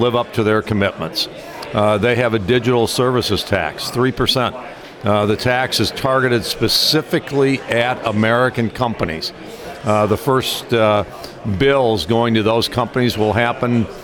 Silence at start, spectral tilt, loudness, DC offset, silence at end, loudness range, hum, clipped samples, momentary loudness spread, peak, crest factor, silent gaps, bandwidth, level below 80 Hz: 0 s; -5 dB/octave; -17 LUFS; under 0.1%; 0 s; 2 LU; none; under 0.1%; 8 LU; 0 dBFS; 16 dB; none; 19 kHz; -44 dBFS